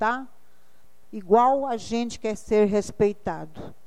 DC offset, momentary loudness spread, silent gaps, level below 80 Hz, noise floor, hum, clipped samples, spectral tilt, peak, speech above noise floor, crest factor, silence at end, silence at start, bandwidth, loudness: 0.9%; 17 LU; none; -54 dBFS; -63 dBFS; none; under 0.1%; -5.5 dB/octave; -6 dBFS; 39 dB; 18 dB; 0.15 s; 0 s; 11.5 kHz; -24 LUFS